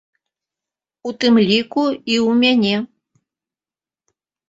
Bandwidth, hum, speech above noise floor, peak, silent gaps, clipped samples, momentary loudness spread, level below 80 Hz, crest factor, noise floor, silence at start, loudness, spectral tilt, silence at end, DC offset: 7.8 kHz; none; over 74 dB; -2 dBFS; none; under 0.1%; 15 LU; -62 dBFS; 18 dB; under -90 dBFS; 1.05 s; -16 LUFS; -5 dB/octave; 1.65 s; under 0.1%